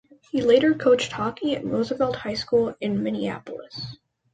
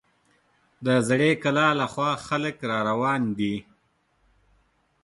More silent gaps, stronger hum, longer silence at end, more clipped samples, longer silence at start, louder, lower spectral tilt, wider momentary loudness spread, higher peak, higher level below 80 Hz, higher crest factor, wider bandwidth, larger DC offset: neither; neither; second, 0.4 s vs 1.4 s; neither; second, 0.35 s vs 0.8 s; about the same, -23 LUFS vs -24 LUFS; about the same, -5.5 dB/octave vs -5.5 dB/octave; first, 17 LU vs 7 LU; about the same, -6 dBFS vs -6 dBFS; about the same, -58 dBFS vs -62 dBFS; about the same, 18 dB vs 20 dB; second, 9 kHz vs 11.5 kHz; neither